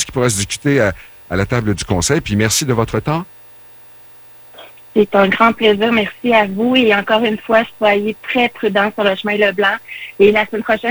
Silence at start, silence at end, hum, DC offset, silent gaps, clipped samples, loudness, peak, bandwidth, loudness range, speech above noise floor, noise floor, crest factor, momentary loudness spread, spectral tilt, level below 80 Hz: 0 s; 0 s; 60 Hz at -50 dBFS; under 0.1%; none; under 0.1%; -15 LUFS; 0 dBFS; over 20 kHz; 5 LU; 25 dB; -39 dBFS; 16 dB; 9 LU; -4.5 dB/octave; -42 dBFS